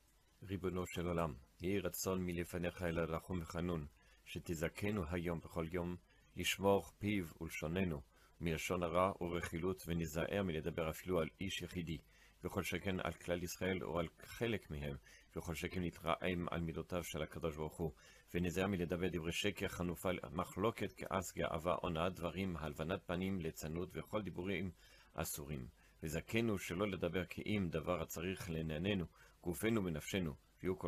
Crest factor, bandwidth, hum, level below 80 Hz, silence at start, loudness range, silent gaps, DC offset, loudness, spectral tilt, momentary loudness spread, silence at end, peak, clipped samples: 20 dB; 15 kHz; none; -62 dBFS; 0.4 s; 3 LU; none; under 0.1%; -42 LUFS; -5.5 dB/octave; 8 LU; 0 s; -20 dBFS; under 0.1%